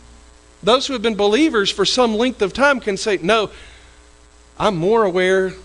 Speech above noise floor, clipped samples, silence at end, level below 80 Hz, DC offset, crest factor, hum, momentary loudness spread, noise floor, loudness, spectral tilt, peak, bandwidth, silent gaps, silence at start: 31 dB; under 0.1%; 0.05 s; -46 dBFS; under 0.1%; 16 dB; none; 5 LU; -47 dBFS; -17 LUFS; -4 dB/octave; -2 dBFS; 11 kHz; none; 0.65 s